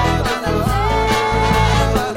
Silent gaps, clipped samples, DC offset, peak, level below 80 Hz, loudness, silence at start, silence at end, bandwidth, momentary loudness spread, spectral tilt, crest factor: none; under 0.1%; under 0.1%; -4 dBFS; -24 dBFS; -16 LUFS; 0 s; 0 s; 16.5 kHz; 4 LU; -5 dB/octave; 12 dB